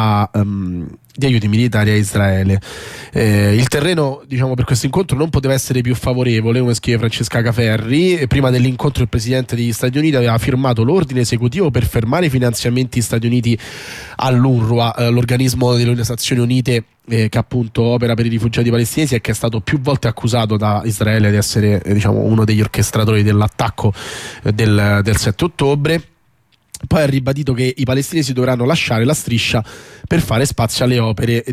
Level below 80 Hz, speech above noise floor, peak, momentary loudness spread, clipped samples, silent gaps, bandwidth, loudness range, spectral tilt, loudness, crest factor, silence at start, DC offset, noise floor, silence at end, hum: -36 dBFS; 43 dB; -4 dBFS; 6 LU; under 0.1%; none; 15.5 kHz; 2 LU; -6 dB/octave; -15 LUFS; 12 dB; 0 s; under 0.1%; -58 dBFS; 0 s; none